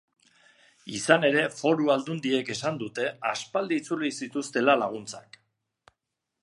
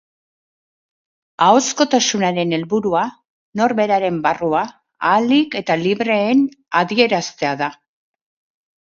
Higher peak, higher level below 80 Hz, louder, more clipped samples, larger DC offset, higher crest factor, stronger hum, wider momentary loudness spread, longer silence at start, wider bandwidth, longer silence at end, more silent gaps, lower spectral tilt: second, -4 dBFS vs 0 dBFS; second, -74 dBFS vs -62 dBFS; second, -26 LUFS vs -17 LUFS; neither; neither; first, 24 dB vs 18 dB; neither; first, 12 LU vs 7 LU; second, 0.85 s vs 1.4 s; first, 11.5 kHz vs 7.6 kHz; first, 1.2 s vs 1.05 s; second, none vs 3.30-3.53 s; about the same, -4 dB/octave vs -4 dB/octave